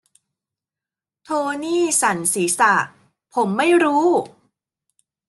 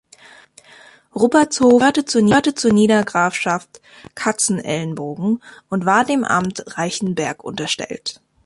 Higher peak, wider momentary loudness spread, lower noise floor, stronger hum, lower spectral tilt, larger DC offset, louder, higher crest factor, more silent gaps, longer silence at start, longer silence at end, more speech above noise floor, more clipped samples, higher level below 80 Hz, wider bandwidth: about the same, -4 dBFS vs -2 dBFS; about the same, 10 LU vs 12 LU; first, -89 dBFS vs -46 dBFS; neither; about the same, -3 dB/octave vs -4 dB/octave; neither; about the same, -18 LUFS vs -18 LUFS; about the same, 18 dB vs 16 dB; neither; first, 1.3 s vs 1.15 s; first, 1 s vs 0.35 s; first, 71 dB vs 29 dB; neither; second, -70 dBFS vs -56 dBFS; about the same, 12.5 kHz vs 11.5 kHz